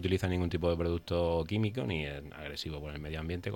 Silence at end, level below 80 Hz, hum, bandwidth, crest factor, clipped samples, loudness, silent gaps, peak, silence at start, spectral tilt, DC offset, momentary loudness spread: 0 s; -50 dBFS; none; 16.5 kHz; 16 dB; under 0.1%; -34 LUFS; none; -16 dBFS; 0 s; -7 dB/octave; under 0.1%; 9 LU